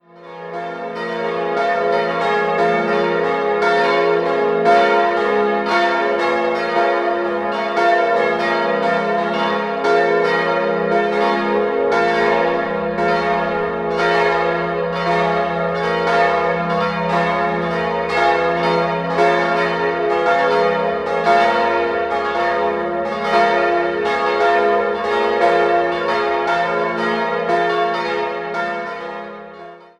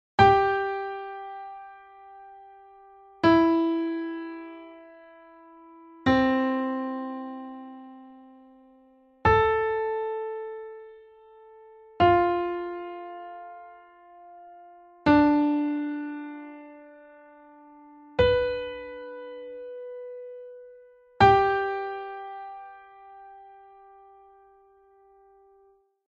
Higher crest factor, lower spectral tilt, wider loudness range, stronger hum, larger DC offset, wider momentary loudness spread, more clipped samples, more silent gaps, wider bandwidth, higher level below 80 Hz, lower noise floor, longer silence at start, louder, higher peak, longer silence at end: second, 16 dB vs 22 dB; second, -5.5 dB/octave vs -7.5 dB/octave; about the same, 2 LU vs 4 LU; neither; neither; second, 6 LU vs 26 LU; neither; neither; first, 10.5 kHz vs 7.8 kHz; about the same, -50 dBFS vs -50 dBFS; second, -37 dBFS vs -62 dBFS; about the same, 0.15 s vs 0.2 s; first, -17 LUFS vs -25 LUFS; first, -2 dBFS vs -6 dBFS; second, 0.15 s vs 2.55 s